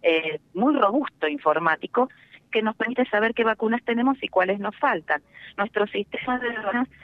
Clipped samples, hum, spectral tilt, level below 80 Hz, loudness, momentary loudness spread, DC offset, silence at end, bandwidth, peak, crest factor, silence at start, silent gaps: under 0.1%; none; -7 dB/octave; -64 dBFS; -24 LUFS; 6 LU; under 0.1%; 0.15 s; 5.8 kHz; -6 dBFS; 18 dB; 0.05 s; none